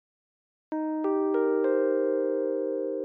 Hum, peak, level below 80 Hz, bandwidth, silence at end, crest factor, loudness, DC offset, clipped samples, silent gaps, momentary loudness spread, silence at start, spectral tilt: none; -16 dBFS; under -90 dBFS; 3.4 kHz; 0 s; 12 dB; -27 LUFS; under 0.1%; under 0.1%; none; 6 LU; 0.7 s; -8.5 dB/octave